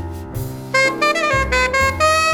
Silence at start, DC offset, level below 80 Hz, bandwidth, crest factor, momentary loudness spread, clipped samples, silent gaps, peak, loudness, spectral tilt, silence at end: 0 s; under 0.1%; -32 dBFS; over 20 kHz; 14 dB; 13 LU; under 0.1%; none; -4 dBFS; -16 LUFS; -3.5 dB/octave; 0 s